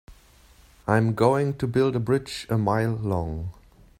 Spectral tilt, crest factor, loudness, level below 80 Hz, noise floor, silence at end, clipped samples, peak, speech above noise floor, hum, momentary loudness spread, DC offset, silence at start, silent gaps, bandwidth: -7.5 dB/octave; 20 dB; -24 LUFS; -48 dBFS; -54 dBFS; 0.5 s; under 0.1%; -6 dBFS; 31 dB; none; 11 LU; under 0.1%; 0.1 s; none; 15.5 kHz